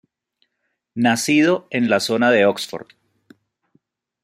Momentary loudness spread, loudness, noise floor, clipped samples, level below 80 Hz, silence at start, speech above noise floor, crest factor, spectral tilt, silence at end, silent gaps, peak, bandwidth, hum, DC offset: 14 LU; -18 LUFS; -74 dBFS; under 0.1%; -68 dBFS; 0.95 s; 57 dB; 18 dB; -4 dB/octave; 1.4 s; none; -2 dBFS; 16 kHz; none; under 0.1%